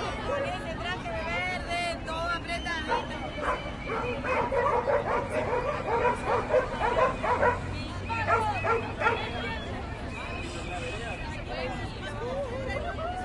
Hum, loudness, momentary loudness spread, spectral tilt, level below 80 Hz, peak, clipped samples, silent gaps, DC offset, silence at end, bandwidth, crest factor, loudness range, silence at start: none; -30 LUFS; 9 LU; -5.5 dB/octave; -42 dBFS; -12 dBFS; under 0.1%; none; under 0.1%; 0 s; 11.5 kHz; 18 dB; 7 LU; 0 s